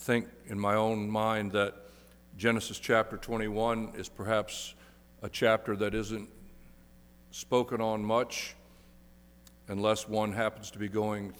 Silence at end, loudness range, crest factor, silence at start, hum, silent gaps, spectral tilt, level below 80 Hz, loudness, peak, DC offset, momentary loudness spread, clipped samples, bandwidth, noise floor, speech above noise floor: 0 s; 4 LU; 20 dB; 0 s; 60 Hz at -60 dBFS; none; -5 dB/octave; -56 dBFS; -32 LUFS; -12 dBFS; under 0.1%; 12 LU; under 0.1%; over 20 kHz; -57 dBFS; 26 dB